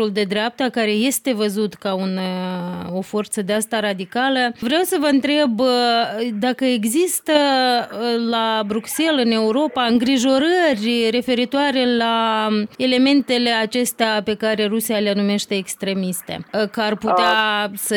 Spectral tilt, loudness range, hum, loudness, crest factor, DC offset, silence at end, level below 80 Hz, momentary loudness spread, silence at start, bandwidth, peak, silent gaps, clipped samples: -3.5 dB/octave; 4 LU; none; -19 LUFS; 16 dB; under 0.1%; 0 s; -62 dBFS; 7 LU; 0 s; 18 kHz; -4 dBFS; none; under 0.1%